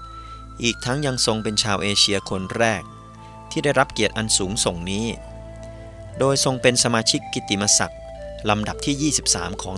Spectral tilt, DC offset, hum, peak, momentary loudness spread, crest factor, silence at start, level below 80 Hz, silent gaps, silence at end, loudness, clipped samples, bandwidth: -3 dB/octave; under 0.1%; none; 0 dBFS; 21 LU; 22 dB; 0 s; -42 dBFS; none; 0 s; -20 LUFS; under 0.1%; 14 kHz